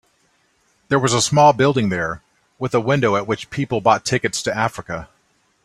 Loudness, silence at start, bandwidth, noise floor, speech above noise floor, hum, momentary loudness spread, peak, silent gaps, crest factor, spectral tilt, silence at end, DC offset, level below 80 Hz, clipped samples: -18 LUFS; 0.9 s; 14.5 kHz; -62 dBFS; 44 dB; none; 15 LU; -2 dBFS; none; 18 dB; -4.5 dB/octave; 0.6 s; under 0.1%; -52 dBFS; under 0.1%